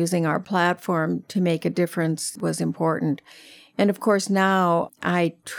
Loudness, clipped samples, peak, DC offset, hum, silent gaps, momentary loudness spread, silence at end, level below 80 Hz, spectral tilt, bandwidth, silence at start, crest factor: -23 LUFS; under 0.1%; -6 dBFS; under 0.1%; none; none; 6 LU; 0 s; -72 dBFS; -5.5 dB/octave; 17 kHz; 0 s; 16 dB